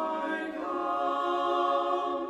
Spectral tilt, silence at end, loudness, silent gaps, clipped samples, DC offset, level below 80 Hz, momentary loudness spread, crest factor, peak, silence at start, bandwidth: -4.5 dB/octave; 0 s; -29 LUFS; none; under 0.1%; under 0.1%; -70 dBFS; 6 LU; 14 dB; -16 dBFS; 0 s; 11.5 kHz